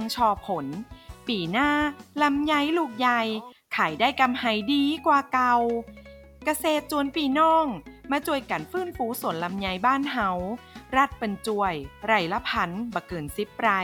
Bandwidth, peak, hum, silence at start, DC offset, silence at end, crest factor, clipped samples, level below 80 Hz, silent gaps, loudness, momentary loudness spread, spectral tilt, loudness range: 18 kHz; -8 dBFS; none; 0 s; under 0.1%; 0 s; 18 dB; under 0.1%; -52 dBFS; none; -25 LUFS; 10 LU; -4.5 dB/octave; 3 LU